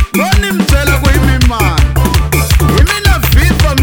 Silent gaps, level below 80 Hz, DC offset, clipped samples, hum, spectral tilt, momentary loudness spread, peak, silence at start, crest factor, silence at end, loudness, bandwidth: none; -12 dBFS; under 0.1%; 0.9%; none; -5 dB/octave; 2 LU; 0 dBFS; 0 s; 8 dB; 0 s; -10 LUFS; over 20 kHz